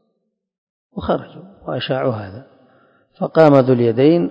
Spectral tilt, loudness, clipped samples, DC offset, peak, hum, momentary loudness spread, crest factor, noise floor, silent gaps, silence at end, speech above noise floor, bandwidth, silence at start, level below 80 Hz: -9 dB/octave; -16 LUFS; 0.1%; under 0.1%; 0 dBFS; none; 20 LU; 18 dB; -72 dBFS; none; 0 s; 56 dB; 8 kHz; 0.95 s; -50 dBFS